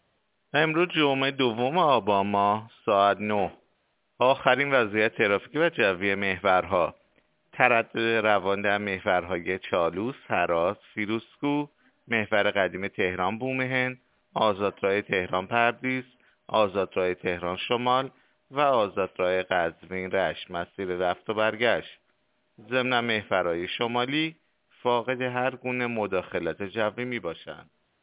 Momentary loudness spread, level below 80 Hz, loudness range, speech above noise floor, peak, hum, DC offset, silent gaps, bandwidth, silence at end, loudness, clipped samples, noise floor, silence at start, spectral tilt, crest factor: 9 LU; -60 dBFS; 4 LU; 47 dB; -4 dBFS; none; under 0.1%; none; 4 kHz; 0.4 s; -26 LUFS; under 0.1%; -72 dBFS; 0.55 s; -9 dB/octave; 24 dB